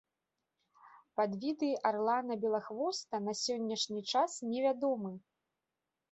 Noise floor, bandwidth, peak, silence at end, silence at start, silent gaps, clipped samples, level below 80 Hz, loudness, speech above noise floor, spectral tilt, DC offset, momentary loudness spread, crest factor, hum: -89 dBFS; 8.2 kHz; -16 dBFS; 0.9 s; 0.85 s; none; under 0.1%; -84 dBFS; -35 LUFS; 55 dB; -4 dB/octave; under 0.1%; 5 LU; 20 dB; none